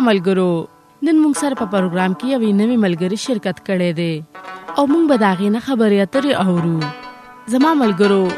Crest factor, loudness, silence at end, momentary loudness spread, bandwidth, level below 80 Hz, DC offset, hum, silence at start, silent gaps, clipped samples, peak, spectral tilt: 14 dB; -17 LUFS; 0 s; 10 LU; 13.5 kHz; -60 dBFS; under 0.1%; none; 0 s; none; under 0.1%; -2 dBFS; -6 dB/octave